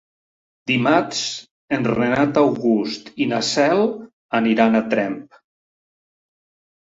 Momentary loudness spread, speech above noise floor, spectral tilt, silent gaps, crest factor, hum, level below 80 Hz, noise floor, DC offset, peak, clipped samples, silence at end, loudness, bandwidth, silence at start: 10 LU; over 71 dB; -5 dB/octave; 1.51-1.68 s, 4.13-4.29 s; 20 dB; none; -60 dBFS; under -90 dBFS; under 0.1%; -2 dBFS; under 0.1%; 1.6 s; -19 LUFS; 8 kHz; 0.65 s